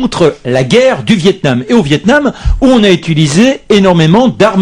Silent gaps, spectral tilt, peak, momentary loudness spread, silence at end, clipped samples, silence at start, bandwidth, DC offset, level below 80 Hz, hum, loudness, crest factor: none; -6 dB/octave; 0 dBFS; 4 LU; 0 s; 1%; 0 s; 11 kHz; under 0.1%; -24 dBFS; none; -8 LUFS; 8 dB